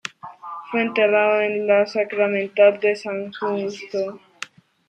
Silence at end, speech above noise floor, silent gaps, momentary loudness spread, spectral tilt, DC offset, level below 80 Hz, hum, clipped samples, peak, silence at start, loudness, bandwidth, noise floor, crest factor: 0.45 s; 20 dB; none; 19 LU; -5 dB/octave; under 0.1%; -76 dBFS; none; under 0.1%; -4 dBFS; 0.05 s; -20 LUFS; 9 kHz; -40 dBFS; 18 dB